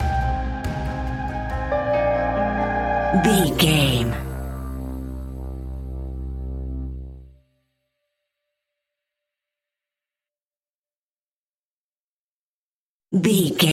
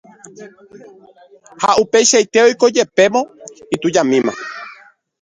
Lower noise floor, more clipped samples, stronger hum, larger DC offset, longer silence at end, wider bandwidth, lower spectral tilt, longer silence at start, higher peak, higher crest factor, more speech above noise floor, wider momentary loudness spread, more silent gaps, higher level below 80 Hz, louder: first, under -90 dBFS vs -45 dBFS; neither; neither; neither; second, 0 s vs 0.5 s; first, 16.5 kHz vs 10.5 kHz; first, -5 dB/octave vs -2.5 dB/octave; second, 0 s vs 0.4 s; second, -4 dBFS vs 0 dBFS; about the same, 20 dB vs 16 dB; first, over 72 dB vs 30 dB; about the same, 16 LU vs 17 LU; first, 10.75-10.82 s, 10.98-11.06 s, 11.37-11.52 s, 11.65-11.90 s, 12.00-13.00 s vs none; first, -34 dBFS vs -60 dBFS; second, -23 LUFS vs -14 LUFS